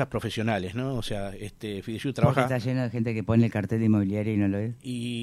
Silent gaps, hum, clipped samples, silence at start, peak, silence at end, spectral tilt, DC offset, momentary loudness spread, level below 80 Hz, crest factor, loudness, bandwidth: none; none; under 0.1%; 0 s; -8 dBFS; 0 s; -7.5 dB/octave; under 0.1%; 10 LU; -50 dBFS; 20 dB; -27 LUFS; 13.5 kHz